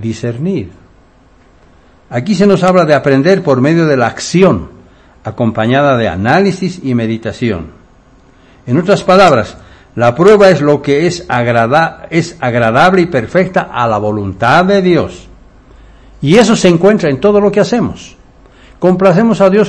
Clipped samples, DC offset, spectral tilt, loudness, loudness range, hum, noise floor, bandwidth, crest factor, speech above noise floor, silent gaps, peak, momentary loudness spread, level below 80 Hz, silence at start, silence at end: 2%; under 0.1%; -6.5 dB/octave; -10 LUFS; 4 LU; none; -44 dBFS; 11 kHz; 10 dB; 35 dB; none; 0 dBFS; 11 LU; -40 dBFS; 0 s; 0 s